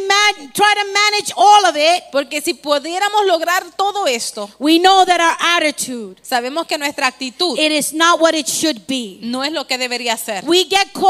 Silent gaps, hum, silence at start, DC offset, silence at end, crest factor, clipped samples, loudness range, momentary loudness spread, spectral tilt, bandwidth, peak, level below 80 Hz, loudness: none; none; 0 s; under 0.1%; 0 s; 16 dB; under 0.1%; 3 LU; 10 LU; -1 dB/octave; 16 kHz; 0 dBFS; -64 dBFS; -15 LUFS